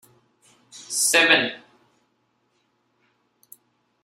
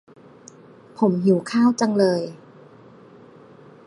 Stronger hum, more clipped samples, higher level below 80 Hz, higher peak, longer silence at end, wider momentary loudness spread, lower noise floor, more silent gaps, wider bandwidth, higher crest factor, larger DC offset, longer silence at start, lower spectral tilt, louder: neither; neither; about the same, -74 dBFS vs -70 dBFS; about the same, -2 dBFS vs -4 dBFS; first, 2.45 s vs 1.5 s; first, 27 LU vs 7 LU; first, -70 dBFS vs -47 dBFS; neither; first, 16 kHz vs 11.5 kHz; first, 26 dB vs 18 dB; neither; second, 0.75 s vs 1 s; second, 0 dB/octave vs -6.5 dB/octave; about the same, -18 LUFS vs -20 LUFS